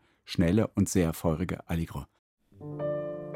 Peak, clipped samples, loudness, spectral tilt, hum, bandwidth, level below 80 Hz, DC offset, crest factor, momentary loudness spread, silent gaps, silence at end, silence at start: -12 dBFS; under 0.1%; -30 LUFS; -6.5 dB/octave; none; 16.5 kHz; -48 dBFS; under 0.1%; 18 dB; 14 LU; 2.19-2.37 s; 0 s; 0.25 s